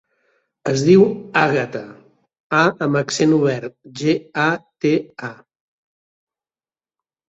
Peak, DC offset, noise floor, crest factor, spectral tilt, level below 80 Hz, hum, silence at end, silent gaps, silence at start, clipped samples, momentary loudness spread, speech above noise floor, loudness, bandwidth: -2 dBFS; under 0.1%; under -90 dBFS; 18 dB; -5.5 dB/octave; -60 dBFS; none; 1.95 s; 2.40-2.50 s; 0.65 s; under 0.1%; 18 LU; over 73 dB; -18 LUFS; 8 kHz